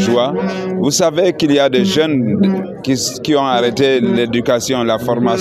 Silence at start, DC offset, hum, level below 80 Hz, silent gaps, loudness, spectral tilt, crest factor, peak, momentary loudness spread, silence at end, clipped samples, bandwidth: 0 s; under 0.1%; none; -50 dBFS; none; -14 LUFS; -4.5 dB/octave; 12 dB; -2 dBFS; 5 LU; 0 s; under 0.1%; 15 kHz